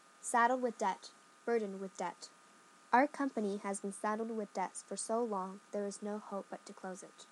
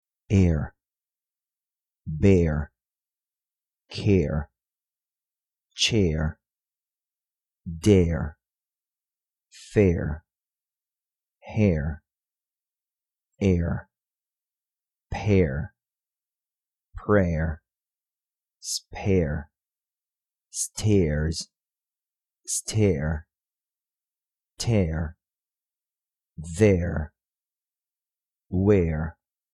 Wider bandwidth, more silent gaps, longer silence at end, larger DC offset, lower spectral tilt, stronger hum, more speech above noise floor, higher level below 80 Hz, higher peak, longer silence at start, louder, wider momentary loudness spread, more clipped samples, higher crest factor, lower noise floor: about the same, 12.5 kHz vs 12 kHz; neither; second, 0.05 s vs 0.4 s; neither; second, -4 dB/octave vs -6 dB/octave; neither; second, 25 dB vs over 67 dB; second, under -90 dBFS vs -40 dBFS; second, -16 dBFS vs -6 dBFS; about the same, 0.2 s vs 0.3 s; second, -37 LUFS vs -25 LUFS; about the same, 16 LU vs 18 LU; neither; about the same, 22 dB vs 22 dB; second, -63 dBFS vs under -90 dBFS